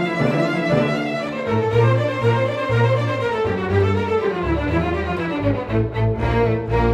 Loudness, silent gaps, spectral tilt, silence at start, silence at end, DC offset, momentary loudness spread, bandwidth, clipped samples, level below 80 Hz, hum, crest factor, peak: -20 LUFS; none; -8 dB/octave; 0 s; 0 s; under 0.1%; 4 LU; 9 kHz; under 0.1%; -34 dBFS; none; 14 dB; -4 dBFS